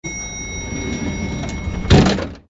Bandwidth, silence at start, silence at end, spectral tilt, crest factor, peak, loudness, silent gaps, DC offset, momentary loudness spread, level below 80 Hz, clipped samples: 8 kHz; 0.05 s; 0.1 s; -5 dB/octave; 18 dB; -2 dBFS; -19 LUFS; none; under 0.1%; 13 LU; -28 dBFS; under 0.1%